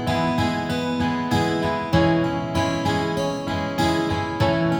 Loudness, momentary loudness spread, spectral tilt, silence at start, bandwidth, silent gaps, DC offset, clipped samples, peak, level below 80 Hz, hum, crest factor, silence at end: -22 LUFS; 4 LU; -6 dB/octave; 0 s; 20 kHz; none; under 0.1%; under 0.1%; -6 dBFS; -42 dBFS; none; 16 dB; 0 s